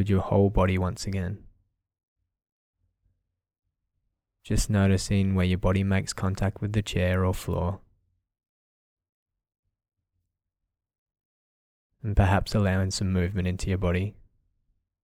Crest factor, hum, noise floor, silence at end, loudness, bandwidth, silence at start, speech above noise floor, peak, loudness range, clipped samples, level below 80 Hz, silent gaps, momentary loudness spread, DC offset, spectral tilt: 20 dB; none; -85 dBFS; 0.9 s; -26 LUFS; 14.5 kHz; 0 s; 61 dB; -8 dBFS; 12 LU; under 0.1%; -40 dBFS; 2.03-2.16 s, 2.52-2.74 s, 3.59-3.63 s, 8.49-8.97 s, 9.09-9.26 s, 9.59-9.63 s, 10.98-11.06 s, 11.25-11.90 s; 8 LU; under 0.1%; -6.5 dB/octave